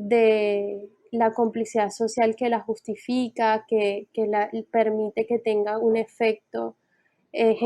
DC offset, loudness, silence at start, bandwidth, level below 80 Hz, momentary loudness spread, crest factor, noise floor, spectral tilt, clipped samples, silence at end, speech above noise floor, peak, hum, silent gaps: under 0.1%; -24 LUFS; 0 s; 11 kHz; -74 dBFS; 9 LU; 16 dB; -68 dBFS; -5 dB/octave; under 0.1%; 0 s; 45 dB; -8 dBFS; none; none